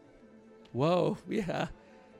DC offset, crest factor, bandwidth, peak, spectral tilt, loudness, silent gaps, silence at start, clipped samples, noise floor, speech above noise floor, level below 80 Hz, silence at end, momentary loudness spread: under 0.1%; 18 dB; 14.5 kHz; -16 dBFS; -7 dB/octave; -32 LUFS; none; 0.25 s; under 0.1%; -56 dBFS; 26 dB; -60 dBFS; 0.45 s; 11 LU